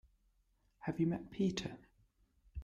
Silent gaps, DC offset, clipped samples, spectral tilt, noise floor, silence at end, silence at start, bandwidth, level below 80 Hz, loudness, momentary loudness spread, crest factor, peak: none; under 0.1%; under 0.1%; -6.5 dB/octave; -76 dBFS; 0 s; 0.8 s; 8.8 kHz; -62 dBFS; -39 LUFS; 15 LU; 18 dB; -24 dBFS